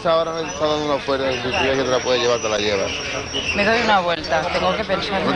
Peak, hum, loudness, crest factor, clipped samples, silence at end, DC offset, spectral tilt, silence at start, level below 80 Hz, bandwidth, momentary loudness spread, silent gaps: -6 dBFS; none; -19 LUFS; 14 dB; under 0.1%; 0 s; under 0.1%; -3.5 dB/octave; 0 s; -44 dBFS; 10.5 kHz; 5 LU; none